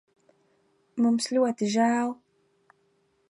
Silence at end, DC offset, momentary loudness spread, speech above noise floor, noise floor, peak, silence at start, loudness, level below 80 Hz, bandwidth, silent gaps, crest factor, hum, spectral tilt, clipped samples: 1.15 s; under 0.1%; 12 LU; 45 dB; -69 dBFS; -12 dBFS; 0.95 s; -25 LUFS; -80 dBFS; 11.5 kHz; none; 16 dB; none; -4.5 dB/octave; under 0.1%